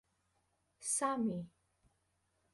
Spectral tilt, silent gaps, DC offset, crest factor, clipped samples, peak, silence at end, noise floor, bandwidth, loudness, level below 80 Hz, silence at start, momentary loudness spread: -4 dB/octave; none; under 0.1%; 20 dB; under 0.1%; -22 dBFS; 1.05 s; -80 dBFS; 11.5 kHz; -37 LUFS; -78 dBFS; 0.8 s; 12 LU